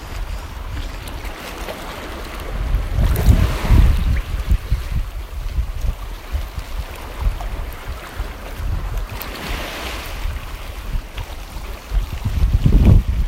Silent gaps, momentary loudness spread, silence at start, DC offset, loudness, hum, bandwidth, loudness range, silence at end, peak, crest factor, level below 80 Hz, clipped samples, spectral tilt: none; 15 LU; 0 s; under 0.1%; -23 LUFS; none; 16.5 kHz; 9 LU; 0 s; 0 dBFS; 20 dB; -20 dBFS; under 0.1%; -6 dB/octave